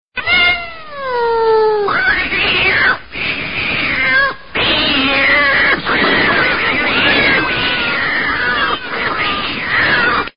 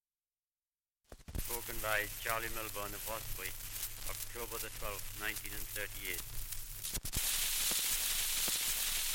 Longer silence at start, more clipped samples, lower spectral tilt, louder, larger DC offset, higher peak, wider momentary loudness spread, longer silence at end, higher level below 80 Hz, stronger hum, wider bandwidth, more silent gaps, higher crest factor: second, 0 s vs 1.1 s; neither; first, -9 dB/octave vs -0.5 dB/octave; first, -12 LUFS vs -36 LUFS; first, 2% vs under 0.1%; first, 0 dBFS vs -16 dBFS; second, 7 LU vs 10 LU; about the same, 0 s vs 0 s; first, -38 dBFS vs -48 dBFS; neither; second, 5.4 kHz vs 17 kHz; neither; second, 14 dB vs 22 dB